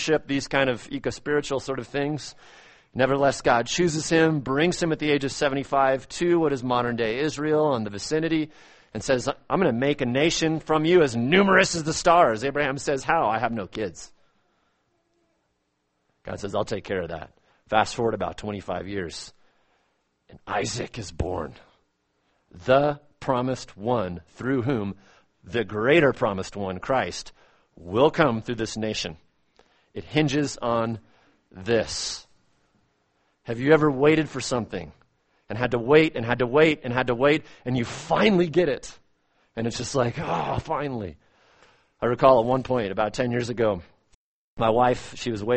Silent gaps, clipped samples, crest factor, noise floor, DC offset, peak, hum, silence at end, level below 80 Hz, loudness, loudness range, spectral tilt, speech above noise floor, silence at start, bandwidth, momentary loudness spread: 44.15-44.57 s; under 0.1%; 22 dB; -74 dBFS; under 0.1%; -2 dBFS; none; 0 s; -50 dBFS; -24 LUFS; 8 LU; -5 dB/octave; 50 dB; 0 s; 8.8 kHz; 14 LU